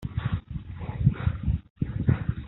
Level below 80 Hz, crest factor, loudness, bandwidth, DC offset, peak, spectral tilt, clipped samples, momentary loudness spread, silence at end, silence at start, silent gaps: -36 dBFS; 20 dB; -29 LUFS; 4.1 kHz; under 0.1%; -8 dBFS; -8.5 dB/octave; under 0.1%; 11 LU; 0 s; 0 s; 1.70-1.76 s